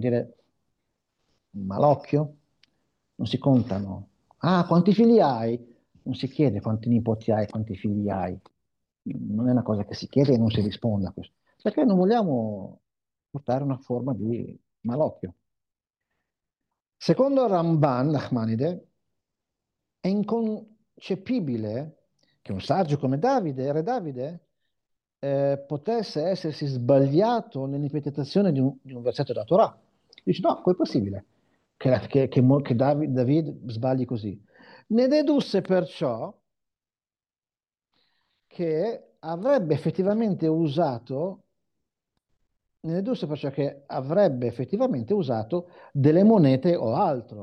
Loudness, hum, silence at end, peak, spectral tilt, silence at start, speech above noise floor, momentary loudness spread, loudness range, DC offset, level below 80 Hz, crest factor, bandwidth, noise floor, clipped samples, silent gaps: -25 LUFS; none; 0 s; -8 dBFS; -9 dB/octave; 0 s; over 66 dB; 14 LU; 7 LU; under 0.1%; -66 dBFS; 18 dB; 8.8 kHz; under -90 dBFS; under 0.1%; none